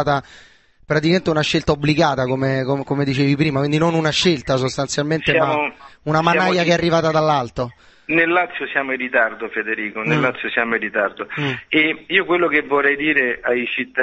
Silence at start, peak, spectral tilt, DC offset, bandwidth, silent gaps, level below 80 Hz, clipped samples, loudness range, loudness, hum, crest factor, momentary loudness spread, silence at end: 0 s; -2 dBFS; -5.5 dB/octave; under 0.1%; 8.4 kHz; none; -48 dBFS; under 0.1%; 2 LU; -18 LUFS; none; 18 dB; 7 LU; 0 s